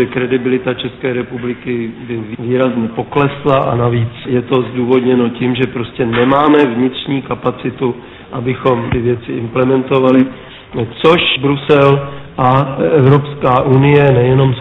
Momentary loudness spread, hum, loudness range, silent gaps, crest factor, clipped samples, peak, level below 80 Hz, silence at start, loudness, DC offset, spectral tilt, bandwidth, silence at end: 11 LU; none; 5 LU; none; 12 dB; 0.1%; 0 dBFS; -40 dBFS; 0 s; -13 LUFS; under 0.1%; -9 dB/octave; 4.8 kHz; 0 s